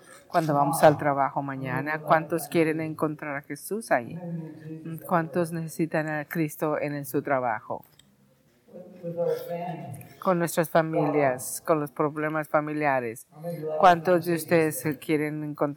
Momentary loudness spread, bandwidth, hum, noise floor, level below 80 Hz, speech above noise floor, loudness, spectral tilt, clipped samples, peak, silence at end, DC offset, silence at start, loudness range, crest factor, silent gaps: 15 LU; 19 kHz; none; -62 dBFS; -70 dBFS; 36 dB; -26 LUFS; -6 dB/octave; under 0.1%; -6 dBFS; 0 s; under 0.1%; 0.1 s; 6 LU; 20 dB; none